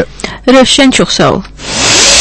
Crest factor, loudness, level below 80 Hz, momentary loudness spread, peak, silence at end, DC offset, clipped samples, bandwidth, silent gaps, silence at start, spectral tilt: 8 dB; -7 LUFS; -30 dBFS; 12 LU; 0 dBFS; 0 s; under 0.1%; 3%; 11 kHz; none; 0 s; -2.5 dB/octave